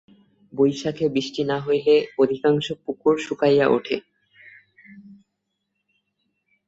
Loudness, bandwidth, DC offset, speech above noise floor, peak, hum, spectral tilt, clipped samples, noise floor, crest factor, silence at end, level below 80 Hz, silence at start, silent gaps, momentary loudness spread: -21 LUFS; 8 kHz; under 0.1%; 57 dB; -6 dBFS; none; -6 dB/octave; under 0.1%; -78 dBFS; 18 dB; 1.55 s; -64 dBFS; 0.55 s; none; 8 LU